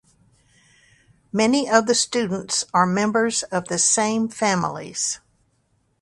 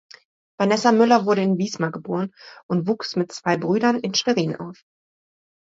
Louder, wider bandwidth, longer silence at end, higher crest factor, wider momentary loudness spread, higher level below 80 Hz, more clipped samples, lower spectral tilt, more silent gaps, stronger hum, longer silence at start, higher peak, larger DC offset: about the same, -20 LUFS vs -21 LUFS; first, 11.5 kHz vs 7.8 kHz; about the same, 0.85 s vs 0.95 s; about the same, 22 dB vs 20 dB; second, 8 LU vs 11 LU; about the same, -62 dBFS vs -66 dBFS; neither; second, -3 dB/octave vs -5.5 dB/octave; second, none vs 2.63-2.69 s; neither; first, 1.35 s vs 0.6 s; about the same, 0 dBFS vs -2 dBFS; neither